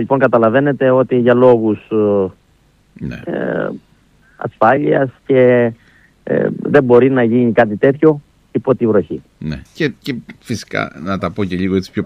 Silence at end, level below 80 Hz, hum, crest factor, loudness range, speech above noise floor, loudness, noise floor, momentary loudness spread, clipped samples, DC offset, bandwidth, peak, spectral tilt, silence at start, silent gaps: 0 s; -48 dBFS; none; 14 dB; 6 LU; 39 dB; -14 LUFS; -53 dBFS; 16 LU; under 0.1%; under 0.1%; 10.5 kHz; 0 dBFS; -8 dB/octave; 0 s; none